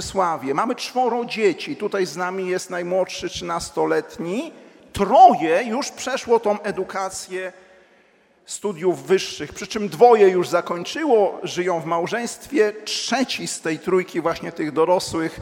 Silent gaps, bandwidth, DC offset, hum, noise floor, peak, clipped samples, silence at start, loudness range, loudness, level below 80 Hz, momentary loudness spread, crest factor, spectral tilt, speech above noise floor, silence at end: none; 16.5 kHz; under 0.1%; none; -57 dBFS; 0 dBFS; under 0.1%; 0 s; 6 LU; -21 LUFS; -54 dBFS; 12 LU; 20 dB; -4 dB/octave; 36 dB; 0 s